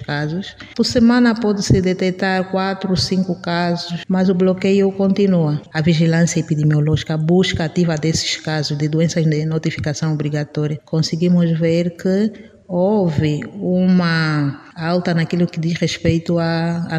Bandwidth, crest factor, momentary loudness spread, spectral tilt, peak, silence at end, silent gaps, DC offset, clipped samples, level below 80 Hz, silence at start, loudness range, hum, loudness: 10 kHz; 16 dB; 6 LU; -6 dB/octave; -2 dBFS; 0 s; none; under 0.1%; under 0.1%; -44 dBFS; 0 s; 2 LU; none; -17 LUFS